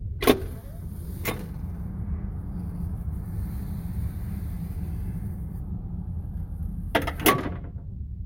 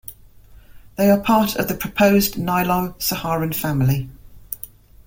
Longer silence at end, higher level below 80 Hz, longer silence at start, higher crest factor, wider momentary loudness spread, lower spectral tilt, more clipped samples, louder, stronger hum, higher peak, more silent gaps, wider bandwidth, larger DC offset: second, 0 s vs 0.4 s; first, -36 dBFS vs -44 dBFS; about the same, 0 s vs 0.1 s; first, 26 dB vs 18 dB; second, 14 LU vs 18 LU; about the same, -5.5 dB/octave vs -5.5 dB/octave; neither; second, -30 LUFS vs -19 LUFS; neither; about the same, -4 dBFS vs -2 dBFS; neither; about the same, 16.5 kHz vs 17 kHz; neither